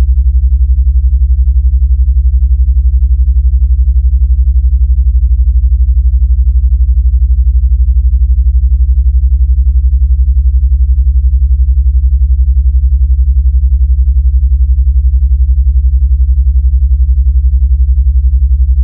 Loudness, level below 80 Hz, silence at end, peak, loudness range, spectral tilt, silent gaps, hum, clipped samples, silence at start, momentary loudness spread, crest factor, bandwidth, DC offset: -10 LUFS; -8 dBFS; 0 s; 0 dBFS; 0 LU; -14 dB/octave; none; none; under 0.1%; 0 s; 1 LU; 6 dB; 0.3 kHz; under 0.1%